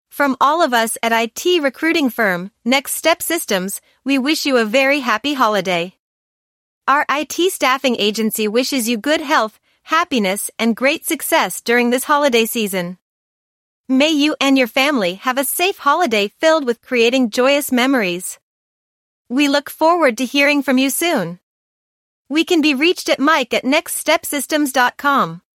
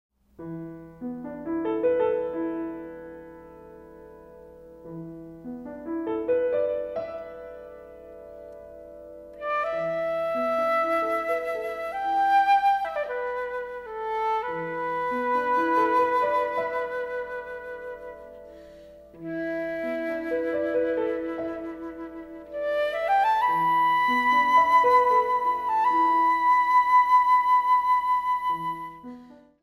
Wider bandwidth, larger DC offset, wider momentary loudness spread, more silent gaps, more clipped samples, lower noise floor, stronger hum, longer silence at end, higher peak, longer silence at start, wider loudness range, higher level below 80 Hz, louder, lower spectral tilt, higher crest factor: first, 16.5 kHz vs 14.5 kHz; neither; second, 6 LU vs 22 LU; first, 5.99-6.81 s, 13.01-13.84 s, 18.42-19.25 s, 21.43-22.25 s vs none; neither; first, under -90 dBFS vs -48 dBFS; neither; about the same, 0.2 s vs 0.3 s; first, -2 dBFS vs -10 dBFS; second, 0.15 s vs 0.4 s; second, 2 LU vs 13 LU; second, -66 dBFS vs -60 dBFS; first, -16 LUFS vs -24 LUFS; second, -3 dB/octave vs -5.5 dB/octave; about the same, 16 dB vs 16 dB